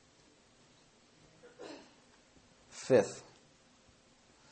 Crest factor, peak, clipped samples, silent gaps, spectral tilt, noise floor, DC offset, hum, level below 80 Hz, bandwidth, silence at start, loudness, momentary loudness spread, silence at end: 26 dB; -14 dBFS; under 0.1%; none; -5 dB/octave; -65 dBFS; under 0.1%; none; -78 dBFS; 8.4 kHz; 1.6 s; -31 LUFS; 23 LU; 1.3 s